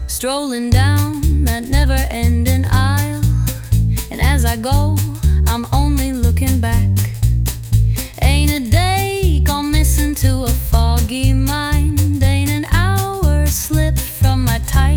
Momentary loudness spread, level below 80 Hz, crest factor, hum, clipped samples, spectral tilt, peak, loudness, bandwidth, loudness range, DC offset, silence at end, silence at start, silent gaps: 3 LU; -18 dBFS; 12 dB; none; under 0.1%; -5.5 dB/octave; -2 dBFS; -16 LUFS; 20 kHz; 1 LU; under 0.1%; 0 s; 0 s; none